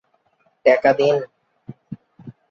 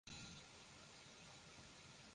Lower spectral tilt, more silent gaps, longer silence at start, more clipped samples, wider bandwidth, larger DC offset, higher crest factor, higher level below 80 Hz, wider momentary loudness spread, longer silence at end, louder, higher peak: first, -6 dB/octave vs -2.5 dB/octave; neither; first, 0.65 s vs 0.05 s; neither; second, 7 kHz vs 11 kHz; neither; about the same, 20 dB vs 18 dB; first, -64 dBFS vs -76 dBFS; first, 23 LU vs 5 LU; first, 0.2 s vs 0 s; first, -17 LUFS vs -59 LUFS; first, -2 dBFS vs -42 dBFS